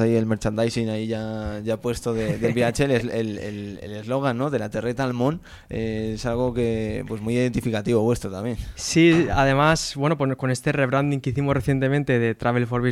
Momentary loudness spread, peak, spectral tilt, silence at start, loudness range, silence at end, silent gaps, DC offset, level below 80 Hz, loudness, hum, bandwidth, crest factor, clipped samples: 10 LU; -6 dBFS; -6 dB/octave; 0 s; 5 LU; 0 s; none; under 0.1%; -42 dBFS; -23 LUFS; none; 14.5 kHz; 16 dB; under 0.1%